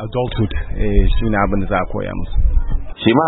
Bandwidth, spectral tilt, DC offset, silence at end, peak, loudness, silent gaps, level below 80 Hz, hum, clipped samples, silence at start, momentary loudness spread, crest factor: 4.1 kHz; -12 dB/octave; under 0.1%; 0 s; 0 dBFS; -20 LUFS; none; -18 dBFS; none; under 0.1%; 0 s; 6 LU; 16 dB